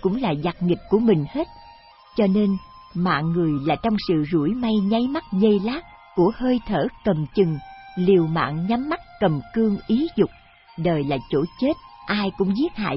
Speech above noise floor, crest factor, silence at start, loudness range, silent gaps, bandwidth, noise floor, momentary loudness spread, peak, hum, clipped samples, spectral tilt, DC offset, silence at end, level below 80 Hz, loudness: 27 dB; 16 dB; 0 s; 2 LU; none; 5.8 kHz; -48 dBFS; 9 LU; -6 dBFS; none; under 0.1%; -11.5 dB/octave; under 0.1%; 0 s; -46 dBFS; -22 LUFS